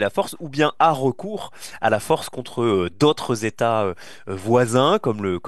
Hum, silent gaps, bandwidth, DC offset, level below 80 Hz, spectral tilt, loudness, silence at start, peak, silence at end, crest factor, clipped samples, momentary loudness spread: none; none; 12.5 kHz; 0.9%; -58 dBFS; -5.5 dB/octave; -21 LUFS; 0 s; -2 dBFS; 0 s; 18 dB; under 0.1%; 13 LU